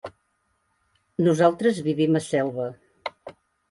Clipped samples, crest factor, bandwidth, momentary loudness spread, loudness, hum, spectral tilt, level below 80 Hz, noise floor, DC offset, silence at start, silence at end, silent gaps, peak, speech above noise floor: under 0.1%; 20 dB; 11.5 kHz; 17 LU; -23 LUFS; none; -6.5 dB/octave; -66 dBFS; -71 dBFS; under 0.1%; 0.05 s; 0.4 s; none; -6 dBFS; 50 dB